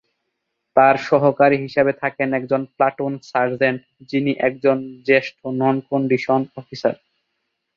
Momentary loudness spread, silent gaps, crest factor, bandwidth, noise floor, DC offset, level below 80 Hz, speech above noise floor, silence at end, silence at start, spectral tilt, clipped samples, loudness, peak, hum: 9 LU; none; 18 dB; 7.2 kHz; -76 dBFS; under 0.1%; -64 dBFS; 57 dB; 0.8 s; 0.75 s; -7.5 dB/octave; under 0.1%; -19 LUFS; -2 dBFS; none